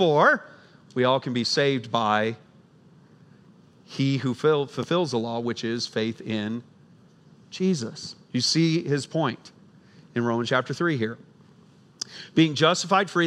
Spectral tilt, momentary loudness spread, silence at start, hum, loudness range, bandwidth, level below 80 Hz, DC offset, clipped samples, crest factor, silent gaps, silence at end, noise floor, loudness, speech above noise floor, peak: -5 dB/octave; 14 LU; 0 s; none; 4 LU; 12 kHz; -76 dBFS; under 0.1%; under 0.1%; 20 dB; none; 0 s; -54 dBFS; -25 LUFS; 30 dB; -6 dBFS